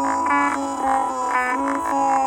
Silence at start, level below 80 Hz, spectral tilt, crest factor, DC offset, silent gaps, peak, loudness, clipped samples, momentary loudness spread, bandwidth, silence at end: 0 s; -54 dBFS; -3.5 dB/octave; 14 dB; under 0.1%; none; -8 dBFS; -21 LUFS; under 0.1%; 3 LU; 17 kHz; 0 s